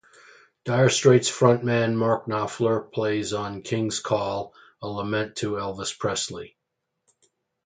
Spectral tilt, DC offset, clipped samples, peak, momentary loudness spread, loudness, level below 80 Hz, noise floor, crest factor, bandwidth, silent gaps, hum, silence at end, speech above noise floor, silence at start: -5 dB/octave; under 0.1%; under 0.1%; -2 dBFS; 14 LU; -24 LUFS; -60 dBFS; -80 dBFS; 22 dB; 9.6 kHz; none; none; 1.2 s; 57 dB; 0.65 s